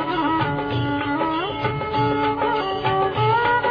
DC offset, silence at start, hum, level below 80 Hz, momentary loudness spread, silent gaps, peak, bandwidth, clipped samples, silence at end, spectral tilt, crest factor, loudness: under 0.1%; 0 s; none; -46 dBFS; 5 LU; none; -8 dBFS; 5.2 kHz; under 0.1%; 0 s; -8.5 dB/octave; 14 dB; -21 LUFS